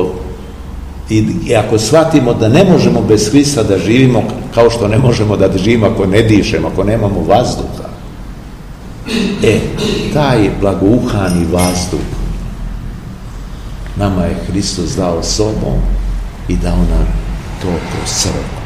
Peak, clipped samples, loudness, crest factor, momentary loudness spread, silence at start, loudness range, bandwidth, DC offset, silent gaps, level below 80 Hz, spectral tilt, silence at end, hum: 0 dBFS; 0.6%; -12 LUFS; 12 dB; 19 LU; 0 s; 7 LU; 15.5 kHz; 0.8%; none; -22 dBFS; -5.5 dB/octave; 0 s; none